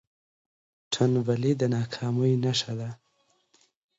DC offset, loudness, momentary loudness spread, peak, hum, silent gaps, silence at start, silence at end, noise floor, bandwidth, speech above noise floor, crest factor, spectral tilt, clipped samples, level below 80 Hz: under 0.1%; -27 LUFS; 10 LU; -10 dBFS; none; none; 0.9 s; 1.05 s; -70 dBFS; 8 kHz; 44 dB; 18 dB; -6 dB/octave; under 0.1%; -66 dBFS